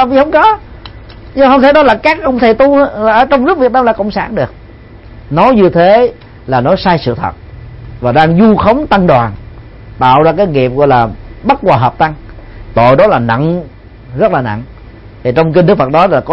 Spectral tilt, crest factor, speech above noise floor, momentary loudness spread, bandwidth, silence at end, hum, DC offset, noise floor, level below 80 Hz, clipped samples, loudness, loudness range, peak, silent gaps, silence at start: -8.5 dB/octave; 10 dB; 25 dB; 12 LU; 6.4 kHz; 0 s; none; under 0.1%; -33 dBFS; -32 dBFS; 0.3%; -9 LUFS; 3 LU; 0 dBFS; none; 0 s